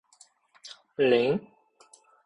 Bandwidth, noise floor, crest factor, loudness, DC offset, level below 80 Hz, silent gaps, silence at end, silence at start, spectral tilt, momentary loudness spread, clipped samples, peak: 10.5 kHz; -60 dBFS; 20 dB; -25 LUFS; under 0.1%; -70 dBFS; none; 0.85 s; 0.65 s; -6 dB/octave; 24 LU; under 0.1%; -10 dBFS